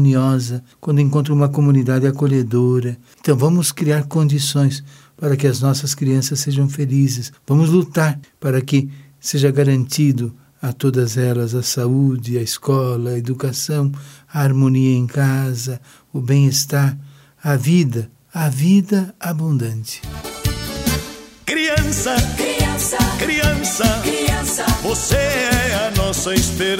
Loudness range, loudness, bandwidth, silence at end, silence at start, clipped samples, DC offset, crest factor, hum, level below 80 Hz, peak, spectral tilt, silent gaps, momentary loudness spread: 3 LU; -18 LUFS; 16.5 kHz; 0 s; 0 s; under 0.1%; under 0.1%; 16 dB; none; -34 dBFS; -2 dBFS; -5.5 dB/octave; none; 10 LU